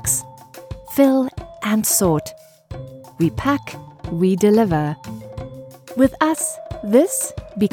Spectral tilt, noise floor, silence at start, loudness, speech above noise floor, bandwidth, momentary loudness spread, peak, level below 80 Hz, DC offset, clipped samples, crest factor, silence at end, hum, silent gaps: -5 dB/octave; -40 dBFS; 0 s; -19 LUFS; 22 dB; 19.5 kHz; 20 LU; -2 dBFS; -44 dBFS; under 0.1%; under 0.1%; 18 dB; 0.05 s; none; none